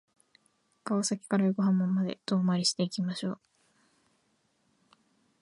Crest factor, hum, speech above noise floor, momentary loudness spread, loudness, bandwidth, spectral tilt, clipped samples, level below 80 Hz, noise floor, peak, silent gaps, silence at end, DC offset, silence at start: 18 dB; none; 44 dB; 10 LU; -29 LUFS; 11.5 kHz; -5 dB/octave; under 0.1%; -80 dBFS; -73 dBFS; -14 dBFS; none; 2.05 s; under 0.1%; 0.85 s